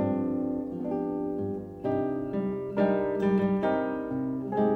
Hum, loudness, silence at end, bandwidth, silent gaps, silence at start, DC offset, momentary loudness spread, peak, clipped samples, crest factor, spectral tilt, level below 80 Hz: none; -29 LUFS; 0 s; 5.8 kHz; none; 0 s; under 0.1%; 6 LU; -14 dBFS; under 0.1%; 14 dB; -10 dB/octave; -58 dBFS